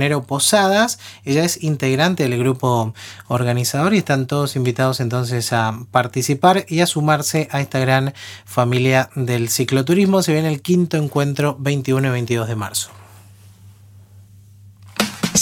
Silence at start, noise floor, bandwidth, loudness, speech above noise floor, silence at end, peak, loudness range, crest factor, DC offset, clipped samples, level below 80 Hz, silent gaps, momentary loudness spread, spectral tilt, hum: 0 s; -44 dBFS; 18 kHz; -18 LUFS; 27 dB; 0 s; 0 dBFS; 5 LU; 18 dB; under 0.1%; under 0.1%; -60 dBFS; none; 7 LU; -5 dB/octave; none